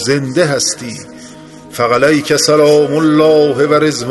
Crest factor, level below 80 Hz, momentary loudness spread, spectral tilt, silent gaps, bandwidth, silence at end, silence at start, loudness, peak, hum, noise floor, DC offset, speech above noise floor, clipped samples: 12 dB; -50 dBFS; 16 LU; -4 dB/octave; none; 12.5 kHz; 0 s; 0 s; -11 LUFS; 0 dBFS; none; -34 dBFS; under 0.1%; 23 dB; under 0.1%